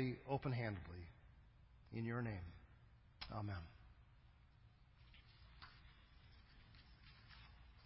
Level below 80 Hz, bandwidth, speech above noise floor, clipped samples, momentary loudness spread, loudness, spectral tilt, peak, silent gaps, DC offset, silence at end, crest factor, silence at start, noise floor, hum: -64 dBFS; 5.6 kHz; 22 dB; under 0.1%; 24 LU; -48 LUFS; -6 dB/octave; -28 dBFS; none; under 0.1%; 0 s; 22 dB; 0 s; -68 dBFS; none